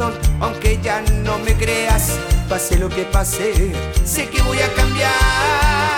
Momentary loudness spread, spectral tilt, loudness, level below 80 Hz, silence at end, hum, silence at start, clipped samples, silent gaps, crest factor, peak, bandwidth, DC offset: 5 LU; -4 dB/octave; -17 LUFS; -20 dBFS; 0 s; none; 0 s; under 0.1%; none; 12 dB; -4 dBFS; 19 kHz; under 0.1%